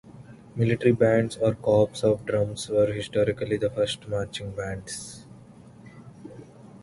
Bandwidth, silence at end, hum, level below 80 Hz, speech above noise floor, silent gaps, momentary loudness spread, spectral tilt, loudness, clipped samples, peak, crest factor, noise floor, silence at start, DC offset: 11.5 kHz; 0.05 s; none; -52 dBFS; 24 dB; none; 22 LU; -6 dB/octave; -25 LUFS; under 0.1%; -6 dBFS; 20 dB; -48 dBFS; 0.05 s; under 0.1%